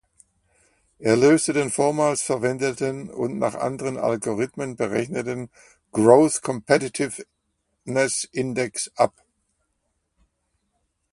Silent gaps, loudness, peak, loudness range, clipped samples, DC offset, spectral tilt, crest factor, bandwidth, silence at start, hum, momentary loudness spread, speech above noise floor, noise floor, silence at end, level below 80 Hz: none; -22 LUFS; 0 dBFS; 5 LU; under 0.1%; under 0.1%; -4.5 dB/octave; 24 dB; 11.5 kHz; 1 s; none; 12 LU; 52 dB; -74 dBFS; 2.05 s; -62 dBFS